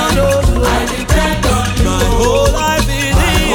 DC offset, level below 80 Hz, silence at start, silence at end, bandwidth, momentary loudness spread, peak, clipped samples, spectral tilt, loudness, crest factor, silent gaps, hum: under 0.1%; -18 dBFS; 0 s; 0 s; 18 kHz; 2 LU; 0 dBFS; under 0.1%; -4.5 dB/octave; -13 LUFS; 12 dB; none; none